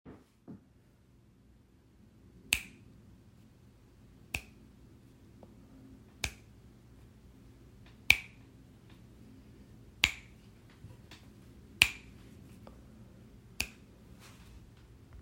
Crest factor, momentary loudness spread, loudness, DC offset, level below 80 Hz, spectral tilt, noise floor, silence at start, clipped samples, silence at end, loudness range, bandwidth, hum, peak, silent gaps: 40 dB; 30 LU; -31 LUFS; under 0.1%; -58 dBFS; -1 dB/octave; -63 dBFS; 0.05 s; under 0.1%; 0 s; 14 LU; 16 kHz; none; -2 dBFS; none